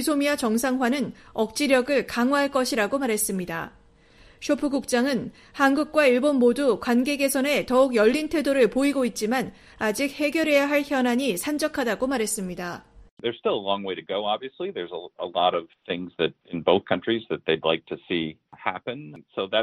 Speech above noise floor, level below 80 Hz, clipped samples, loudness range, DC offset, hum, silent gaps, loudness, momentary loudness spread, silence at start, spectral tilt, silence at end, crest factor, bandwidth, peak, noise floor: 30 dB; -58 dBFS; under 0.1%; 6 LU; under 0.1%; none; 13.11-13.17 s; -24 LUFS; 12 LU; 0 s; -4 dB/octave; 0 s; 20 dB; 15.5 kHz; -4 dBFS; -54 dBFS